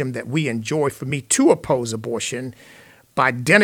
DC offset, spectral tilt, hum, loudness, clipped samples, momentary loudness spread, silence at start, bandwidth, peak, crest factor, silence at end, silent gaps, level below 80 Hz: under 0.1%; -4.5 dB/octave; none; -21 LUFS; under 0.1%; 11 LU; 0 s; 18.5 kHz; -2 dBFS; 20 dB; 0 s; none; -56 dBFS